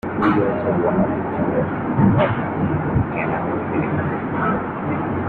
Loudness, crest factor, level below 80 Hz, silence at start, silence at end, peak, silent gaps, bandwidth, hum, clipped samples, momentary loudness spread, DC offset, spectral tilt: -20 LUFS; 16 dB; -42 dBFS; 0.05 s; 0 s; -4 dBFS; none; 4.5 kHz; none; under 0.1%; 5 LU; under 0.1%; -10.5 dB/octave